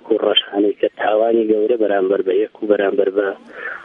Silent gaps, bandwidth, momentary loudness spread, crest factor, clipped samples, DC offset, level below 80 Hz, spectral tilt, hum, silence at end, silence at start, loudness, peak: none; 3.8 kHz; 5 LU; 16 dB; under 0.1%; under 0.1%; -70 dBFS; -7 dB/octave; none; 0 s; 0.05 s; -17 LUFS; 0 dBFS